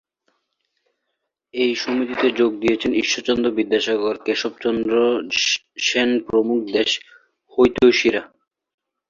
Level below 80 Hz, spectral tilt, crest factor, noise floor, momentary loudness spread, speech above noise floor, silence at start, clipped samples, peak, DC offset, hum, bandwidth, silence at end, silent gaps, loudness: -54 dBFS; -3 dB/octave; 18 dB; -77 dBFS; 7 LU; 58 dB; 1.55 s; under 0.1%; -2 dBFS; under 0.1%; none; 7.6 kHz; 0.85 s; none; -19 LUFS